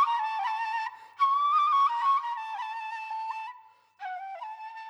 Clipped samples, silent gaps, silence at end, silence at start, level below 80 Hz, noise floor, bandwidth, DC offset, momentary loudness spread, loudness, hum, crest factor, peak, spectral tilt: under 0.1%; none; 0 s; 0 s; under -90 dBFS; -54 dBFS; 9.6 kHz; under 0.1%; 16 LU; -28 LUFS; none; 14 dB; -16 dBFS; 2 dB/octave